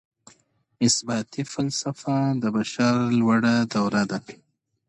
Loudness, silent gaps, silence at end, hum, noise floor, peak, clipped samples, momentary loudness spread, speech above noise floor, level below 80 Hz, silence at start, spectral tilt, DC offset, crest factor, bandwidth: -23 LUFS; none; 0.55 s; none; -62 dBFS; -8 dBFS; under 0.1%; 8 LU; 39 dB; -62 dBFS; 0.8 s; -4.5 dB/octave; under 0.1%; 16 dB; 10.5 kHz